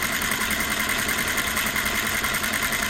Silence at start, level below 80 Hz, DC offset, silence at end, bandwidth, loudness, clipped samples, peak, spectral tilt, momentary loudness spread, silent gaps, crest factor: 0 s; -42 dBFS; under 0.1%; 0 s; 16.5 kHz; -22 LUFS; under 0.1%; -8 dBFS; -1.5 dB/octave; 0 LU; none; 18 dB